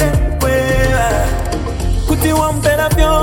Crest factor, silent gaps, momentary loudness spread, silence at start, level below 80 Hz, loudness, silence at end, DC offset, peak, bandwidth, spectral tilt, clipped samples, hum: 12 dB; none; 6 LU; 0 s; -18 dBFS; -15 LUFS; 0 s; under 0.1%; 0 dBFS; 17 kHz; -5.5 dB/octave; under 0.1%; none